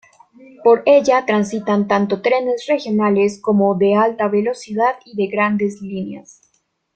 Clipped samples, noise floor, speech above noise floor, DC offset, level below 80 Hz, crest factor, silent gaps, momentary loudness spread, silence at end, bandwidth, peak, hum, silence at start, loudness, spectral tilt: under 0.1%; -65 dBFS; 48 dB; under 0.1%; -62 dBFS; 16 dB; none; 10 LU; 0.75 s; 9 kHz; -2 dBFS; none; 0.6 s; -17 LUFS; -6.5 dB/octave